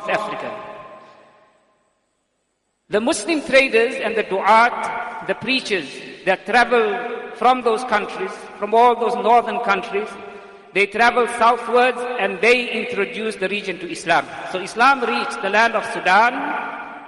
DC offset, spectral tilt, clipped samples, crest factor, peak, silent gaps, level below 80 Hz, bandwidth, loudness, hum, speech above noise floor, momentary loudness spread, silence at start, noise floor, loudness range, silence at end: under 0.1%; -3.5 dB/octave; under 0.1%; 16 dB; -2 dBFS; none; -60 dBFS; 11.5 kHz; -18 LUFS; none; 52 dB; 12 LU; 0 s; -70 dBFS; 3 LU; 0 s